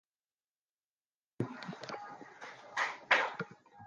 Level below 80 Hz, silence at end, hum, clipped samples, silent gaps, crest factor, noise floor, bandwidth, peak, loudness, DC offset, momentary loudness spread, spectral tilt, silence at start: -80 dBFS; 0 s; none; under 0.1%; none; 28 dB; under -90 dBFS; 10 kHz; -12 dBFS; -35 LUFS; under 0.1%; 20 LU; -4 dB/octave; 1.4 s